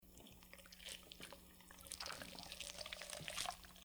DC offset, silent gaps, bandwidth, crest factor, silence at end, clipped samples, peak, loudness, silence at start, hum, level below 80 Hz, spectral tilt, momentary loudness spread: under 0.1%; none; over 20 kHz; 30 dB; 0 s; under 0.1%; -22 dBFS; -50 LUFS; 0 s; none; -68 dBFS; -1 dB/octave; 14 LU